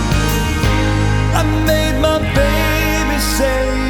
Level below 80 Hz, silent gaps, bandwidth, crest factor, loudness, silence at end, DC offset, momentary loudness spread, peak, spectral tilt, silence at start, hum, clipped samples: -20 dBFS; none; 19.5 kHz; 14 dB; -15 LUFS; 0 s; under 0.1%; 1 LU; 0 dBFS; -5 dB/octave; 0 s; none; under 0.1%